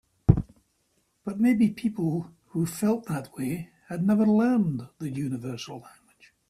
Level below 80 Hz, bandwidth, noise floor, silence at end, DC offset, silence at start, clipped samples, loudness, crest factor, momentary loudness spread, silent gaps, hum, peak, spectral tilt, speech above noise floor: -46 dBFS; 14.5 kHz; -71 dBFS; 0.6 s; under 0.1%; 0.3 s; under 0.1%; -27 LUFS; 24 dB; 15 LU; none; none; -4 dBFS; -7.5 dB/octave; 45 dB